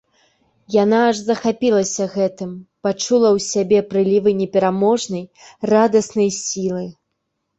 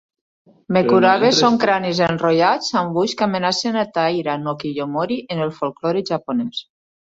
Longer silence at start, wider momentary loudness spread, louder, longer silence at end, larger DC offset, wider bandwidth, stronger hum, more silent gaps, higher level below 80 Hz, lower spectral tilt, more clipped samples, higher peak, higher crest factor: about the same, 0.7 s vs 0.7 s; about the same, 11 LU vs 10 LU; about the same, -18 LUFS vs -18 LUFS; first, 0.7 s vs 0.4 s; neither; about the same, 8.2 kHz vs 7.8 kHz; neither; neither; about the same, -60 dBFS vs -58 dBFS; about the same, -5 dB/octave vs -5 dB/octave; neither; about the same, -2 dBFS vs -2 dBFS; about the same, 16 dB vs 16 dB